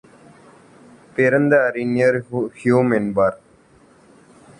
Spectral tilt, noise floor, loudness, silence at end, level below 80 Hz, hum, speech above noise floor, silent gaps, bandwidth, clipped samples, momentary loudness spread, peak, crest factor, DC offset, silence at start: -8 dB/octave; -52 dBFS; -18 LUFS; 1.25 s; -58 dBFS; none; 34 dB; none; 10.5 kHz; under 0.1%; 7 LU; -4 dBFS; 18 dB; under 0.1%; 1.15 s